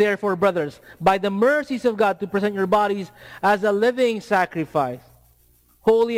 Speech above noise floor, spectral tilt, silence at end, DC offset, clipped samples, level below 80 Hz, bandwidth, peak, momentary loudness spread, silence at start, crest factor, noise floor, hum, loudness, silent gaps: 37 dB; -6 dB/octave; 0 s; under 0.1%; under 0.1%; -56 dBFS; 16 kHz; -6 dBFS; 8 LU; 0 s; 14 dB; -58 dBFS; none; -21 LUFS; none